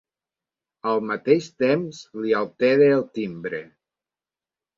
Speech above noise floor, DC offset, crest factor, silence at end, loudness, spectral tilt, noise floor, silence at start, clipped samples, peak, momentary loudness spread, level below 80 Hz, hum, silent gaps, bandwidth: over 68 dB; under 0.1%; 20 dB; 1.15 s; -22 LUFS; -6.5 dB/octave; under -90 dBFS; 0.85 s; under 0.1%; -4 dBFS; 14 LU; -68 dBFS; none; none; 7.4 kHz